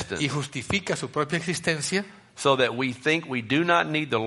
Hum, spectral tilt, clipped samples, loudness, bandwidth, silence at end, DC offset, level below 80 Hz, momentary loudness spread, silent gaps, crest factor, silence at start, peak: none; -4 dB/octave; under 0.1%; -25 LUFS; 11.5 kHz; 0 s; under 0.1%; -58 dBFS; 6 LU; none; 20 dB; 0 s; -6 dBFS